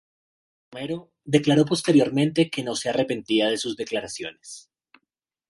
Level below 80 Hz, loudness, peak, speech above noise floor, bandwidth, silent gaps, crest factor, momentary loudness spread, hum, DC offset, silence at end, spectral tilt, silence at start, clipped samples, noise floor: -66 dBFS; -23 LUFS; -4 dBFS; 60 dB; 11.5 kHz; none; 20 dB; 17 LU; none; under 0.1%; 0.9 s; -5 dB/octave; 0.7 s; under 0.1%; -83 dBFS